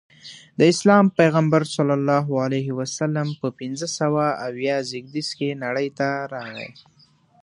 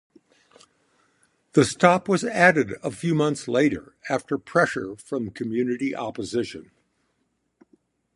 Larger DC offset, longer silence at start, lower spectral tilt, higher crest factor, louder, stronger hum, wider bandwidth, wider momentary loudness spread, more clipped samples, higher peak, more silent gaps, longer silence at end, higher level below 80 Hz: neither; second, 0.25 s vs 1.55 s; about the same, -5.5 dB/octave vs -5.5 dB/octave; about the same, 20 dB vs 24 dB; about the same, -21 LUFS vs -23 LUFS; neither; about the same, 11 kHz vs 11.5 kHz; about the same, 15 LU vs 13 LU; neither; about the same, -2 dBFS vs -2 dBFS; neither; second, 0.75 s vs 1.55 s; second, -66 dBFS vs -60 dBFS